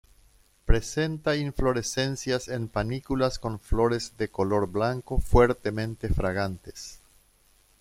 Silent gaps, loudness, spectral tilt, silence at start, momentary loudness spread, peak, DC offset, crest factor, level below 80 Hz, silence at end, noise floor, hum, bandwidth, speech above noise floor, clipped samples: none; -27 LUFS; -5.5 dB/octave; 0.65 s; 9 LU; -4 dBFS; under 0.1%; 22 dB; -34 dBFS; 0.85 s; -62 dBFS; none; 15.5 kHz; 36 dB; under 0.1%